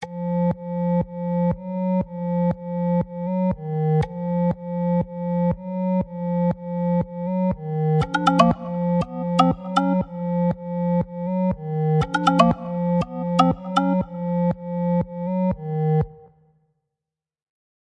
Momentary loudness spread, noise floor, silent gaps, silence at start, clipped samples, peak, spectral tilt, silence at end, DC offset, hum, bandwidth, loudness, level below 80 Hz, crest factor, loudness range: 6 LU; -87 dBFS; none; 0 s; under 0.1%; 0 dBFS; -8 dB/octave; 1.6 s; under 0.1%; none; 8.8 kHz; -23 LUFS; -46 dBFS; 22 dB; 3 LU